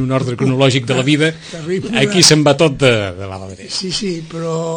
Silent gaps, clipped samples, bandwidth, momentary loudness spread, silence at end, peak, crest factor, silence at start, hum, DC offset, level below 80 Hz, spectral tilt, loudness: none; under 0.1%; 16 kHz; 15 LU; 0 s; 0 dBFS; 14 dB; 0 s; none; under 0.1%; -46 dBFS; -4 dB/octave; -14 LUFS